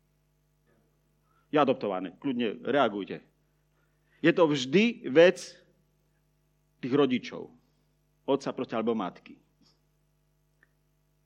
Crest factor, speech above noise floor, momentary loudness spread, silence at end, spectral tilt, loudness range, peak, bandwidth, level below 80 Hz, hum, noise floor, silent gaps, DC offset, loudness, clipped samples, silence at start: 22 dB; 44 dB; 19 LU; 1.9 s; -5.5 dB/octave; 9 LU; -8 dBFS; 10 kHz; -74 dBFS; 50 Hz at -60 dBFS; -71 dBFS; none; under 0.1%; -27 LUFS; under 0.1%; 1.55 s